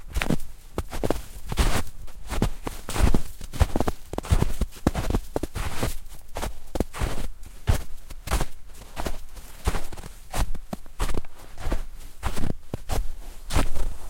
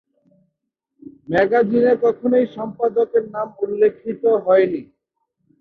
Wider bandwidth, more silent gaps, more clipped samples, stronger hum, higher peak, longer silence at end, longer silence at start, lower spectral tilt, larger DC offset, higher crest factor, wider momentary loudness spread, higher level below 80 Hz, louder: first, 16.5 kHz vs 5 kHz; neither; neither; neither; about the same, -2 dBFS vs -4 dBFS; second, 0 s vs 0.8 s; second, 0 s vs 1.3 s; second, -5 dB/octave vs -8.5 dB/octave; first, 0.2% vs under 0.1%; first, 22 dB vs 16 dB; first, 15 LU vs 9 LU; first, -30 dBFS vs -60 dBFS; second, -30 LUFS vs -18 LUFS